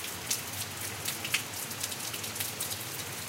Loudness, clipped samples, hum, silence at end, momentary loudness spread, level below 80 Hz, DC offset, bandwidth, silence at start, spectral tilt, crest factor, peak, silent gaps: -33 LUFS; under 0.1%; none; 0 s; 4 LU; -68 dBFS; under 0.1%; 17 kHz; 0 s; -1 dB/octave; 24 dB; -12 dBFS; none